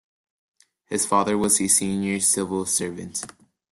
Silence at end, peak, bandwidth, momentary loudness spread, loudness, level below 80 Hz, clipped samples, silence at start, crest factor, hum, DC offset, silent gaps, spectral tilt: 0.45 s; -4 dBFS; 12.5 kHz; 13 LU; -21 LUFS; -60 dBFS; under 0.1%; 0.9 s; 20 dB; none; under 0.1%; none; -3 dB/octave